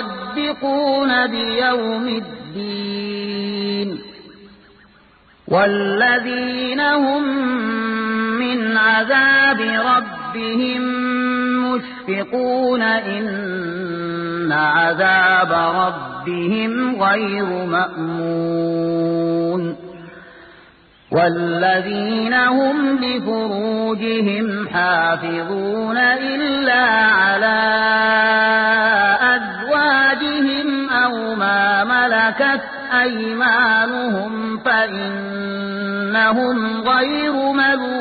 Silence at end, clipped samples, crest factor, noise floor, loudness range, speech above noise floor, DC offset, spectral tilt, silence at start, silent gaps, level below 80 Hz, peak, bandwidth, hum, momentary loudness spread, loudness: 0 s; under 0.1%; 14 dB; -51 dBFS; 6 LU; 33 dB; under 0.1%; -10 dB/octave; 0 s; none; -56 dBFS; -2 dBFS; 4.8 kHz; none; 10 LU; -17 LUFS